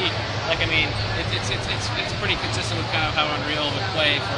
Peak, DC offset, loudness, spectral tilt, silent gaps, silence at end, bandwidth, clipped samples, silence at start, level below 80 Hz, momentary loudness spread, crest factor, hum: -4 dBFS; under 0.1%; -22 LUFS; -4 dB/octave; none; 0 s; 11.5 kHz; under 0.1%; 0 s; -40 dBFS; 4 LU; 18 dB; none